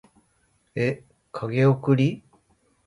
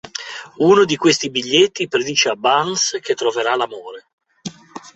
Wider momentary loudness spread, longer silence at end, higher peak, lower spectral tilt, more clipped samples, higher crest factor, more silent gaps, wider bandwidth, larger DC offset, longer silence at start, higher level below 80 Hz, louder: about the same, 18 LU vs 20 LU; first, 0.65 s vs 0.05 s; second, -6 dBFS vs 0 dBFS; first, -8.5 dB/octave vs -3 dB/octave; neither; about the same, 18 dB vs 18 dB; second, none vs 4.13-4.18 s; first, 10.5 kHz vs 8.2 kHz; neither; first, 0.75 s vs 0.05 s; about the same, -64 dBFS vs -62 dBFS; second, -23 LUFS vs -16 LUFS